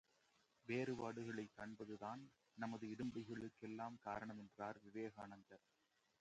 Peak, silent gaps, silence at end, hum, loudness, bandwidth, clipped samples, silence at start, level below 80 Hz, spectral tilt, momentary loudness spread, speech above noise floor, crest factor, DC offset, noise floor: -30 dBFS; none; 0.65 s; none; -51 LUFS; 9 kHz; under 0.1%; 0.65 s; -82 dBFS; -6.5 dB/octave; 12 LU; 29 dB; 20 dB; under 0.1%; -80 dBFS